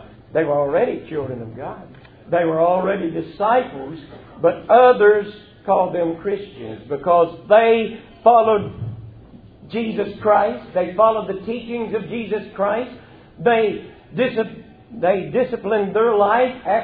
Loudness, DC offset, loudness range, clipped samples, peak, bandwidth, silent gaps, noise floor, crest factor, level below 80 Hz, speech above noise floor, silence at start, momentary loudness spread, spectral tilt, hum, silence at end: -19 LUFS; under 0.1%; 5 LU; under 0.1%; 0 dBFS; 4.8 kHz; none; -43 dBFS; 18 dB; -54 dBFS; 25 dB; 0 s; 18 LU; -10 dB/octave; none; 0 s